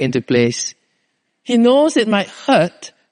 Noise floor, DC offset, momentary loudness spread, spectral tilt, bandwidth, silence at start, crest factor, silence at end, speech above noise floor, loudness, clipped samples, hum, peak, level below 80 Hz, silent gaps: -68 dBFS; under 0.1%; 13 LU; -4.5 dB/octave; 10 kHz; 0 s; 16 dB; 0.25 s; 53 dB; -16 LUFS; under 0.1%; none; 0 dBFS; -62 dBFS; none